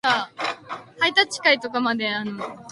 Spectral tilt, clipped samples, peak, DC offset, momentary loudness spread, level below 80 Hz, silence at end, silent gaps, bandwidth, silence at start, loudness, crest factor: -2.5 dB/octave; under 0.1%; -2 dBFS; under 0.1%; 14 LU; -70 dBFS; 0 s; none; 11.5 kHz; 0.05 s; -22 LUFS; 22 dB